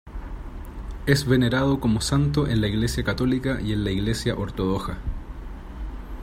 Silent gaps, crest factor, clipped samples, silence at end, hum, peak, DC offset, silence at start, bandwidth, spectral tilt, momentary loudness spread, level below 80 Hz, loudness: none; 20 dB; under 0.1%; 0 s; none; -4 dBFS; under 0.1%; 0.05 s; 16 kHz; -6 dB/octave; 18 LU; -34 dBFS; -24 LUFS